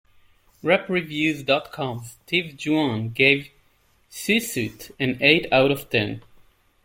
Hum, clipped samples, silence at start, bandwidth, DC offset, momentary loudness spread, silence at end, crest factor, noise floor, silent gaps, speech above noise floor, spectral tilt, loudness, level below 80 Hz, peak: none; under 0.1%; 0.65 s; 17 kHz; under 0.1%; 13 LU; 0.65 s; 22 dB; -61 dBFS; none; 39 dB; -4.5 dB/octave; -22 LUFS; -58 dBFS; -2 dBFS